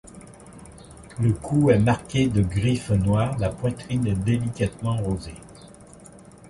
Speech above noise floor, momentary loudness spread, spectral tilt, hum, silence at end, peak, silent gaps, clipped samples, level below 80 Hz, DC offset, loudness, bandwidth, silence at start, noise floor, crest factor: 24 dB; 24 LU; -7 dB/octave; none; 0 s; -6 dBFS; none; under 0.1%; -42 dBFS; under 0.1%; -23 LUFS; 11.5 kHz; 0.05 s; -46 dBFS; 18 dB